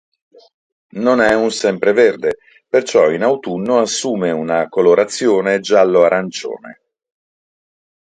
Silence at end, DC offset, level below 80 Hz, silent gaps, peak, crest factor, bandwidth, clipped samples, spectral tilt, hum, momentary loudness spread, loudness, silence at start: 1.35 s; under 0.1%; -58 dBFS; none; 0 dBFS; 16 dB; 9.4 kHz; under 0.1%; -4 dB/octave; none; 10 LU; -15 LUFS; 0.95 s